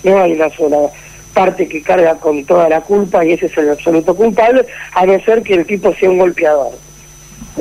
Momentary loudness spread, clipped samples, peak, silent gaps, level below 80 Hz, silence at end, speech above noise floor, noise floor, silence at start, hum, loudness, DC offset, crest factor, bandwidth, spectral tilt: 5 LU; under 0.1%; -2 dBFS; none; -44 dBFS; 0 s; 26 dB; -37 dBFS; 0.05 s; none; -12 LUFS; under 0.1%; 10 dB; 15.5 kHz; -6 dB/octave